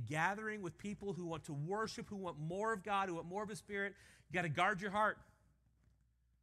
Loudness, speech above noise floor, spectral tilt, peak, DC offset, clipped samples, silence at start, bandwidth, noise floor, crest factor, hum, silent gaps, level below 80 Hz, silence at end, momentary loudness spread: -41 LUFS; 35 dB; -5 dB/octave; -22 dBFS; under 0.1%; under 0.1%; 0 s; 14 kHz; -76 dBFS; 20 dB; none; none; -72 dBFS; 1.2 s; 10 LU